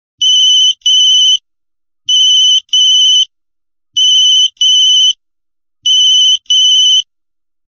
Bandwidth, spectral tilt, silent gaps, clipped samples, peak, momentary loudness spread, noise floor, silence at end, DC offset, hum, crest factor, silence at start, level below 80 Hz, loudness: 7 kHz; 6.5 dB/octave; none; under 0.1%; -2 dBFS; 6 LU; -82 dBFS; 0.7 s; 0.3%; none; 8 dB; 0.2 s; -58 dBFS; -6 LUFS